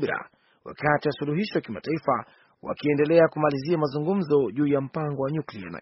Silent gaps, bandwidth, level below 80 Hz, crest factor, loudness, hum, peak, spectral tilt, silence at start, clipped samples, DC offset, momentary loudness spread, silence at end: none; 6 kHz; -62 dBFS; 20 dB; -25 LUFS; none; -6 dBFS; -6 dB/octave; 0 s; under 0.1%; under 0.1%; 12 LU; 0 s